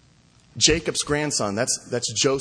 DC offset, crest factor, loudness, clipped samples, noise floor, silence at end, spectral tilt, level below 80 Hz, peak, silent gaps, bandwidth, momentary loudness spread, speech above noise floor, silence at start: under 0.1%; 20 dB; -22 LUFS; under 0.1%; -56 dBFS; 0 s; -2.5 dB/octave; -44 dBFS; -4 dBFS; none; 10.5 kHz; 6 LU; 33 dB; 0.55 s